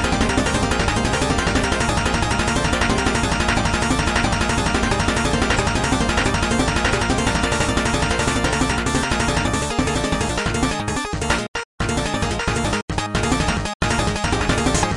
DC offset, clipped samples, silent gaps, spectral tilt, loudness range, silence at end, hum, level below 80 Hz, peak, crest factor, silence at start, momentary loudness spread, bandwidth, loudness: under 0.1%; under 0.1%; 11.48-11.54 s, 11.65-11.78 s, 12.82-12.88 s, 13.75-13.80 s; -4 dB/octave; 3 LU; 0 s; none; -28 dBFS; -4 dBFS; 16 dB; 0 s; 3 LU; 11.5 kHz; -20 LUFS